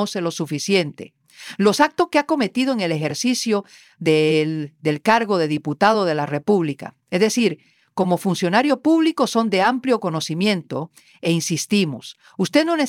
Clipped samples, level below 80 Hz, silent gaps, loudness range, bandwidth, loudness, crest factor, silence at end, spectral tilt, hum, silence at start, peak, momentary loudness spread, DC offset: under 0.1%; -68 dBFS; none; 1 LU; 16.5 kHz; -20 LUFS; 18 dB; 0 s; -5 dB/octave; none; 0 s; -2 dBFS; 10 LU; under 0.1%